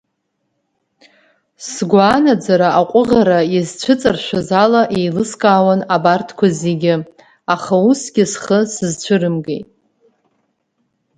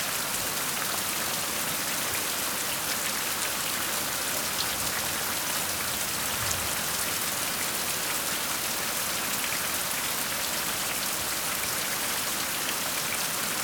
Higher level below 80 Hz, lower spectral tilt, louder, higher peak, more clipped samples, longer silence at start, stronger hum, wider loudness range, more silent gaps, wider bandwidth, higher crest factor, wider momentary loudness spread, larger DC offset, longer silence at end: about the same, -52 dBFS vs -56 dBFS; first, -5.5 dB/octave vs -0.5 dB/octave; first, -14 LUFS vs -27 LUFS; first, 0 dBFS vs -8 dBFS; neither; first, 1.6 s vs 0 s; neither; first, 4 LU vs 0 LU; neither; second, 9.6 kHz vs over 20 kHz; second, 16 dB vs 22 dB; first, 9 LU vs 1 LU; neither; first, 1.55 s vs 0 s